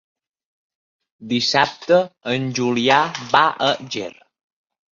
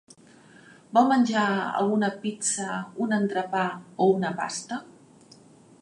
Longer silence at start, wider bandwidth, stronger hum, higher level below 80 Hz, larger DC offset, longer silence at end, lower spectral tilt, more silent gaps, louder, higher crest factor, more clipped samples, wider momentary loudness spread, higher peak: first, 1.2 s vs 0.9 s; second, 7.6 kHz vs 11.5 kHz; neither; first, -62 dBFS vs -78 dBFS; neither; about the same, 0.85 s vs 0.9 s; about the same, -4 dB/octave vs -4.5 dB/octave; neither; first, -19 LUFS vs -25 LUFS; about the same, 20 dB vs 20 dB; neither; about the same, 9 LU vs 10 LU; first, -2 dBFS vs -6 dBFS